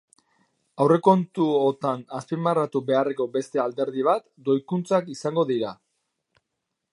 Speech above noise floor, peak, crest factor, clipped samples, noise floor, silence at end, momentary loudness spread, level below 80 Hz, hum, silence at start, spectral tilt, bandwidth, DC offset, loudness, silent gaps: 58 dB; -4 dBFS; 22 dB; under 0.1%; -81 dBFS; 1.2 s; 8 LU; -76 dBFS; none; 0.8 s; -7 dB/octave; 11.5 kHz; under 0.1%; -24 LUFS; none